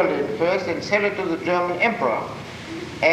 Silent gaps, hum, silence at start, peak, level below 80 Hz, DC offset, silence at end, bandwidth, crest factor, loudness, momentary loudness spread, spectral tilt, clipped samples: none; none; 0 s; -6 dBFS; -54 dBFS; under 0.1%; 0 s; 15 kHz; 16 dB; -22 LUFS; 13 LU; -5.5 dB/octave; under 0.1%